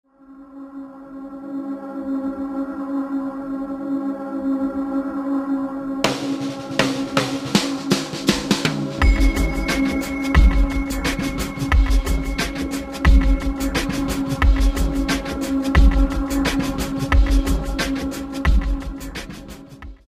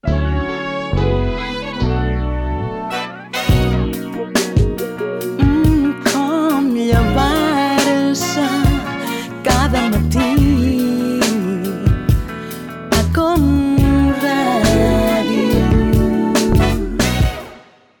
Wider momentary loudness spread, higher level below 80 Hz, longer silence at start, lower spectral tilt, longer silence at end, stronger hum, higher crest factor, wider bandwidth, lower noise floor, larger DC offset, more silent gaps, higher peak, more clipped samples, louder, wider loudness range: first, 13 LU vs 9 LU; about the same, -22 dBFS vs -24 dBFS; first, 0.3 s vs 0.05 s; about the same, -5.5 dB/octave vs -6 dB/octave; second, 0.15 s vs 0.4 s; neither; first, 18 dB vs 12 dB; second, 15 kHz vs 19 kHz; about the same, -44 dBFS vs -42 dBFS; neither; neither; about the same, -2 dBFS vs -4 dBFS; neither; second, -22 LUFS vs -16 LUFS; about the same, 6 LU vs 5 LU